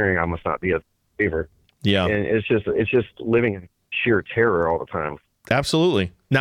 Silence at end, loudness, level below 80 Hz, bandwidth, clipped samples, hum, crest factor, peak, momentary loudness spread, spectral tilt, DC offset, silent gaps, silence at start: 0 s; -22 LUFS; -48 dBFS; 14 kHz; under 0.1%; none; 16 dB; -6 dBFS; 9 LU; -6 dB/octave; under 0.1%; none; 0 s